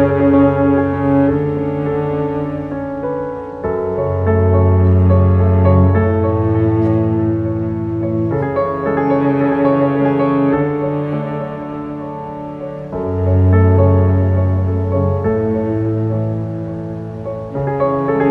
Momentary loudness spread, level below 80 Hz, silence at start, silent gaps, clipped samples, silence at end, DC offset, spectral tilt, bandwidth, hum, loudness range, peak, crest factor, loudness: 13 LU; -38 dBFS; 0 s; none; under 0.1%; 0 s; under 0.1%; -11.5 dB/octave; 4.2 kHz; none; 5 LU; 0 dBFS; 14 dB; -16 LUFS